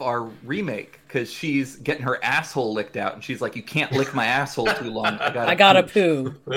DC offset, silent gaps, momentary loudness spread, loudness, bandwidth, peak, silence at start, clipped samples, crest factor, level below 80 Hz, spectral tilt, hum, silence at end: under 0.1%; none; 13 LU; -22 LUFS; 17.5 kHz; 0 dBFS; 0 s; under 0.1%; 22 dB; -58 dBFS; -5 dB/octave; none; 0 s